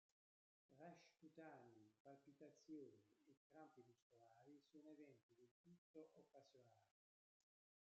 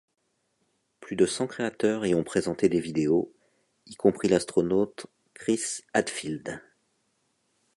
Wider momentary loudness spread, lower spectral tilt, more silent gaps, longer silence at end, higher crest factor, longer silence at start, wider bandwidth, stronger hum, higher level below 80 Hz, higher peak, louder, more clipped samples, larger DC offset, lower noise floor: second, 7 LU vs 12 LU; about the same, -5.5 dB/octave vs -5 dB/octave; first, 2.00-2.05 s, 3.37-3.50 s, 4.02-4.10 s, 5.23-5.29 s, 5.51-5.64 s, 5.78-5.94 s vs none; second, 1 s vs 1.15 s; about the same, 18 dB vs 22 dB; second, 0.7 s vs 1 s; second, 7.4 kHz vs 11.5 kHz; neither; second, under -90 dBFS vs -62 dBFS; second, -50 dBFS vs -6 dBFS; second, -67 LUFS vs -27 LUFS; neither; neither; first, under -90 dBFS vs -74 dBFS